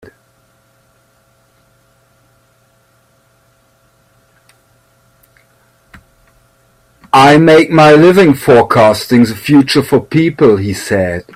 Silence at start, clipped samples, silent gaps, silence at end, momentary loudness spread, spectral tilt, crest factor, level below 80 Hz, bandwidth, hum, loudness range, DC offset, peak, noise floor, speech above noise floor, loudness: 7.15 s; under 0.1%; none; 0.15 s; 10 LU; -6 dB/octave; 12 dB; -48 dBFS; 16 kHz; none; 5 LU; under 0.1%; 0 dBFS; -53 dBFS; 45 dB; -8 LUFS